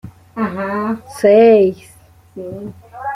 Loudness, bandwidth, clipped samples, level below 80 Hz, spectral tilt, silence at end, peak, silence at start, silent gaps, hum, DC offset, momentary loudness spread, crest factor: -14 LUFS; 13 kHz; under 0.1%; -54 dBFS; -7 dB/octave; 0 s; -2 dBFS; 0.05 s; none; none; under 0.1%; 23 LU; 14 dB